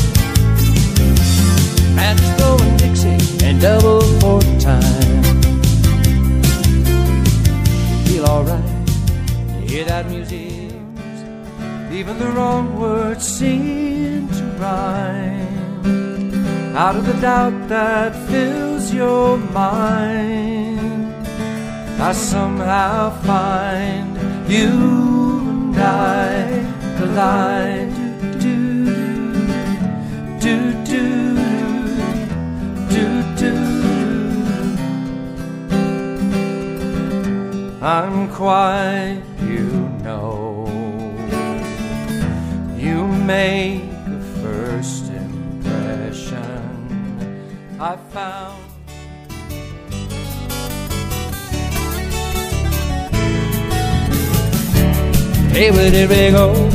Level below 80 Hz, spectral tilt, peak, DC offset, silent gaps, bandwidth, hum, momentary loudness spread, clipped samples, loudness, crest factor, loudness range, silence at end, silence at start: -24 dBFS; -6 dB/octave; 0 dBFS; under 0.1%; none; 15.5 kHz; none; 13 LU; under 0.1%; -17 LUFS; 16 dB; 12 LU; 0 s; 0 s